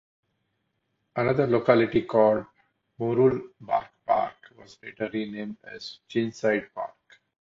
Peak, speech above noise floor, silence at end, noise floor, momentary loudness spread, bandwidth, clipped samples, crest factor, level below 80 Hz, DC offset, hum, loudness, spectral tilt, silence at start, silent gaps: -6 dBFS; 51 dB; 0.55 s; -76 dBFS; 17 LU; 7.6 kHz; under 0.1%; 22 dB; -62 dBFS; under 0.1%; none; -25 LUFS; -7.5 dB/octave; 1.15 s; none